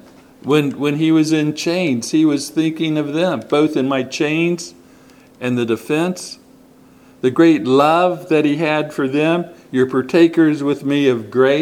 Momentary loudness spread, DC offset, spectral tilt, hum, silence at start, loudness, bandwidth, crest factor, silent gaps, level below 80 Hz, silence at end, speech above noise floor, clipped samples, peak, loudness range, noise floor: 8 LU; under 0.1%; -5.5 dB/octave; none; 0.45 s; -17 LUFS; 14.5 kHz; 16 dB; none; -64 dBFS; 0 s; 31 dB; under 0.1%; 0 dBFS; 5 LU; -46 dBFS